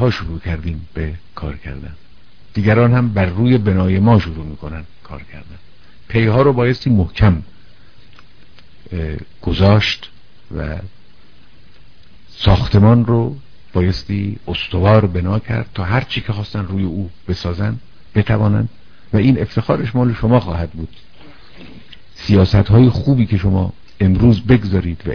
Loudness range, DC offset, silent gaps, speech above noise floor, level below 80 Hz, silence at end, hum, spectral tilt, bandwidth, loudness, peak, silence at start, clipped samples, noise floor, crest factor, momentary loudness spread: 5 LU; 2%; none; 34 dB; -32 dBFS; 0 s; none; -8.5 dB/octave; 5.4 kHz; -16 LUFS; 0 dBFS; 0 s; under 0.1%; -48 dBFS; 16 dB; 17 LU